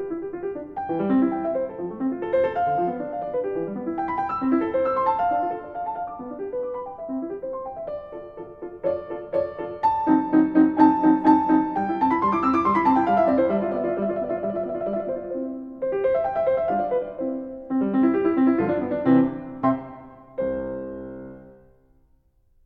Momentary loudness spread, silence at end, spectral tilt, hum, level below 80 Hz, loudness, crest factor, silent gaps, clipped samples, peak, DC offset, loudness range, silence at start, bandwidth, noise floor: 14 LU; 1.15 s; -9.5 dB/octave; none; -56 dBFS; -23 LUFS; 20 dB; none; under 0.1%; -4 dBFS; under 0.1%; 10 LU; 0 s; 5.4 kHz; -61 dBFS